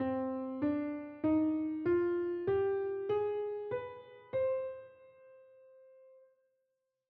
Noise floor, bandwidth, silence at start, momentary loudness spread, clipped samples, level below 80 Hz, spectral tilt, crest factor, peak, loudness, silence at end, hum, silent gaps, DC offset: -84 dBFS; 4.5 kHz; 0 s; 9 LU; under 0.1%; -72 dBFS; -7 dB/octave; 14 dB; -22 dBFS; -35 LUFS; 1.7 s; none; none; under 0.1%